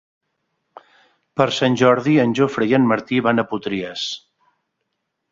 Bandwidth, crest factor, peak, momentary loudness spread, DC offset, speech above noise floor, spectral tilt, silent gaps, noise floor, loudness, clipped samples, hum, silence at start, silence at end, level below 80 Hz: 7.6 kHz; 18 dB; -2 dBFS; 11 LU; under 0.1%; 58 dB; -6 dB/octave; none; -75 dBFS; -18 LUFS; under 0.1%; none; 1.35 s; 1.15 s; -60 dBFS